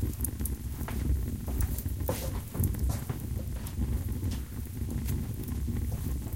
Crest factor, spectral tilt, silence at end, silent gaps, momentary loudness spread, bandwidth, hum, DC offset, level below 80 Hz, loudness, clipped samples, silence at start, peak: 20 dB; -6 dB/octave; 0 s; none; 4 LU; 17 kHz; none; 0.2%; -36 dBFS; -34 LUFS; under 0.1%; 0 s; -12 dBFS